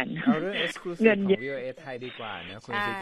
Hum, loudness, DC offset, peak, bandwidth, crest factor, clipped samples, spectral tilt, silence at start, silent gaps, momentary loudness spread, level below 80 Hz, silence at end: none; -27 LUFS; under 0.1%; -8 dBFS; 12.5 kHz; 20 dB; under 0.1%; -6 dB/octave; 0 s; none; 14 LU; -66 dBFS; 0 s